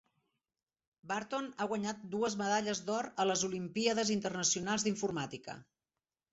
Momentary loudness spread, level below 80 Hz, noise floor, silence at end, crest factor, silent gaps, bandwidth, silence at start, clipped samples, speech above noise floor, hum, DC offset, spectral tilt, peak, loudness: 8 LU; -74 dBFS; under -90 dBFS; 0.7 s; 18 dB; none; 8 kHz; 1.05 s; under 0.1%; over 55 dB; none; under 0.1%; -3.5 dB/octave; -18 dBFS; -35 LUFS